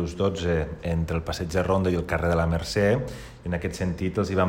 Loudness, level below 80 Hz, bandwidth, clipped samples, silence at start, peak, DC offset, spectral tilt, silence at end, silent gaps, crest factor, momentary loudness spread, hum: -26 LUFS; -38 dBFS; 16 kHz; under 0.1%; 0 s; -10 dBFS; under 0.1%; -6.5 dB/octave; 0 s; none; 16 dB; 6 LU; none